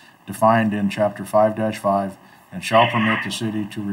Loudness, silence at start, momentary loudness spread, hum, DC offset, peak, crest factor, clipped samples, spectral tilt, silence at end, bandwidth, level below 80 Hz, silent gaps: -20 LUFS; 0.25 s; 12 LU; none; under 0.1%; -4 dBFS; 16 dB; under 0.1%; -5.5 dB/octave; 0 s; 16 kHz; -66 dBFS; none